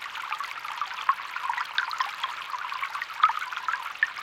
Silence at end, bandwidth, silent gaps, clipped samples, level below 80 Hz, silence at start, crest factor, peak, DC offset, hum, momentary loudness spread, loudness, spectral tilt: 0 s; 17 kHz; none; under 0.1%; -76 dBFS; 0 s; 24 dB; -6 dBFS; under 0.1%; none; 8 LU; -29 LUFS; 1.5 dB/octave